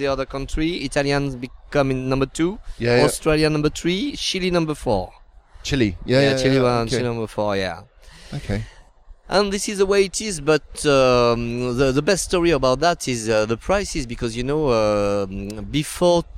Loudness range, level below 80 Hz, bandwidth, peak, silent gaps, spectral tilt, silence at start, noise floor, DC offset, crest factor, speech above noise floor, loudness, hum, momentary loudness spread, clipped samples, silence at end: 4 LU; -36 dBFS; 15.5 kHz; -2 dBFS; none; -5 dB/octave; 0 s; -45 dBFS; under 0.1%; 18 dB; 25 dB; -20 LUFS; none; 10 LU; under 0.1%; 0 s